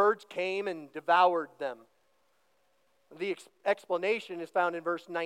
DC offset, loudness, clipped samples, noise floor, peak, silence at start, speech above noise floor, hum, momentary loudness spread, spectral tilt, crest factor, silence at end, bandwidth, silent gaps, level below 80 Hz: under 0.1%; -31 LUFS; under 0.1%; -73 dBFS; -12 dBFS; 0 s; 42 dB; none; 14 LU; -4.5 dB/octave; 20 dB; 0 s; 13 kHz; none; under -90 dBFS